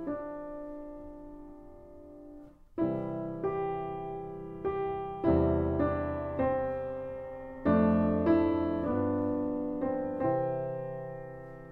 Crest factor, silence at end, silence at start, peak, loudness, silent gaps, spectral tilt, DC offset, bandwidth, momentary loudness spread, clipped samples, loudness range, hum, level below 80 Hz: 16 dB; 0 s; 0 s; -14 dBFS; -32 LUFS; none; -11 dB/octave; under 0.1%; 4.3 kHz; 21 LU; under 0.1%; 8 LU; none; -50 dBFS